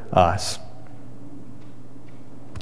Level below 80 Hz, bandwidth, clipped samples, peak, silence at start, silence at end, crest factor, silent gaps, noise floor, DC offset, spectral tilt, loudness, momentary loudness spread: -48 dBFS; 11 kHz; under 0.1%; -2 dBFS; 0 s; 0 s; 24 dB; none; -45 dBFS; 3%; -4.5 dB/octave; -23 LUFS; 26 LU